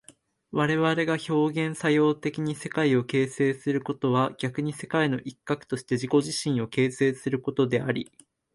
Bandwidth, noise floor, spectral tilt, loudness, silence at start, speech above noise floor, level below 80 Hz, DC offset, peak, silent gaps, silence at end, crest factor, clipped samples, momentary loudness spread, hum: 11.5 kHz; -57 dBFS; -6 dB/octave; -26 LUFS; 0.55 s; 32 dB; -66 dBFS; under 0.1%; -10 dBFS; none; 0.5 s; 16 dB; under 0.1%; 7 LU; none